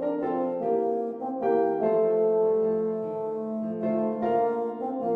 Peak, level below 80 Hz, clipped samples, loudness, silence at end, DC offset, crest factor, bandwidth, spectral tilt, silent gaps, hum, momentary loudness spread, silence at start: -14 dBFS; -72 dBFS; under 0.1%; -27 LUFS; 0 s; under 0.1%; 12 dB; 4 kHz; -10 dB/octave; none; none; 8 LU; 0 s